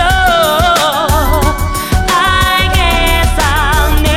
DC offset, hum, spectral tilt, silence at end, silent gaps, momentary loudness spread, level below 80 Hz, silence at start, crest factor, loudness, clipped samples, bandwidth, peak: under 0.1%; none; -4 dB/octave; 0 s; none; 4 LU; -16 dBFS; 0 s; 10 dB; -11 LUFS; under 0.1%; 17 kHz; 0 dBFS